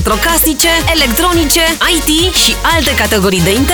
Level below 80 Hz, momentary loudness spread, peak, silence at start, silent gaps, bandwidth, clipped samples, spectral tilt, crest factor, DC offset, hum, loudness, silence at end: -22 dBFS; 2 LU; 0 dBFS; 0 s; none; over 20 kHz; under 0.1%; -2.5 dB/octave; 10 dB; under 0.1%; none; -9 LUFS; 0 s